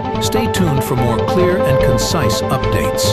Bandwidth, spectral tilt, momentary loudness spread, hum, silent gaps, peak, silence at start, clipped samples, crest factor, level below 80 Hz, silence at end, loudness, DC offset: 15 kHz; -5 dB/octave; 3 LU; none; none; -2 dBFS; 0 s; under 0.1%; 12 dB; -30 dBFS; 0 s; -15 LUFS; 1%